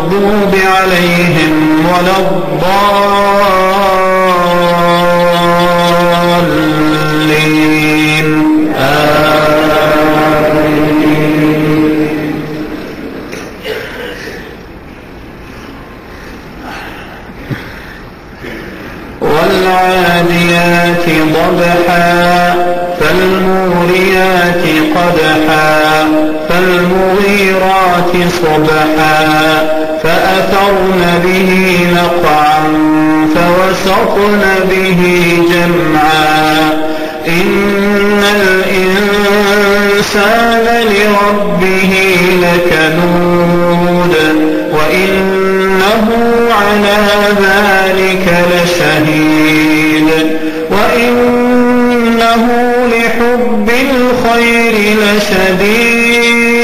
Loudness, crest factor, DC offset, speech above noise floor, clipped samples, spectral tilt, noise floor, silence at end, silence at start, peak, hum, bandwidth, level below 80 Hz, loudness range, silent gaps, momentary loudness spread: -8 LUFS; 8 dB; under 0.1%; 20 dB; under 0.1%; -5 dB/octave; -28 dBFS; 0 s; 0 s; 0 dBFS; none; 15.5 kHz; -32 dBFS; 7 LU; none; 12 LU